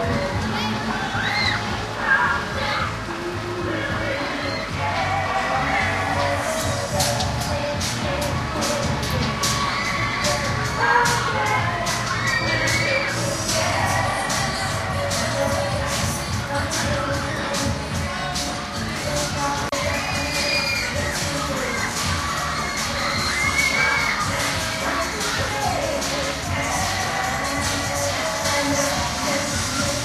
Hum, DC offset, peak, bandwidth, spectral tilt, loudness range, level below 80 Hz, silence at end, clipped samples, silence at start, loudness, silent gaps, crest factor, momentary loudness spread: none; under 0.1%; -6 dBFS; 15.5 kHz; -3 dB/octave; 3 LU; -38 dBFS; 0 s; under 0.1%; 0 s; -22 LUFS; none; 18 dB; 5 LU